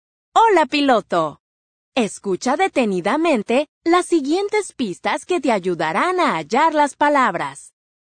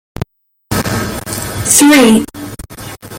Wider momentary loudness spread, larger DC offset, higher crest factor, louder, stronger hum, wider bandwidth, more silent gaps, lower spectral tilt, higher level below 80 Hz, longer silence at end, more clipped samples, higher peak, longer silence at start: second, 7 LU vs 22 LU; neither; about the same, 16 dB vs 14 dB; second, -18 LUFS vs -10 LUFS; neither; second, 9.6 kHz vs 17 kHz; first, 1.40-1.92 s, 3.68-3.81 s vs none; about the same, -4.5 dB/octave vs -3.5 dB/octave; second, -64 dBFS vs -36 dBFS; first, 0.4 s vs 0 s; neither; about the same, -2 dBFS vs 0 dBFS; second, 0.35 s vs 0.7 s